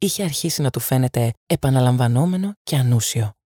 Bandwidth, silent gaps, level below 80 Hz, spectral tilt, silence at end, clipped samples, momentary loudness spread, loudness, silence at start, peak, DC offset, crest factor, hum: 19 kHz; 1.37-1.47 s, 2.57-2.65 s; -50 dBFS; -5.5 dB/octave; 0.15 s; under 0.1%; 5 LU; -20 LUFS; 0 s; -6 dBFS; under 0.1%; 14 dB; none